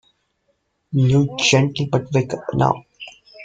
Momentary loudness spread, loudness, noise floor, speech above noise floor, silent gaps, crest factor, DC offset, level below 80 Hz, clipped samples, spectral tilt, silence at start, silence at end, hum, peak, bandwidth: 18 LU; -19 LUFS; -68 dBFS; 51 dB; none; 18 dB; under 0.1%; -50 dBFS; under 0.1%; -5.5 dB/octave; 0.9 s; 0 s; none; -2 dBFS; 9 kHz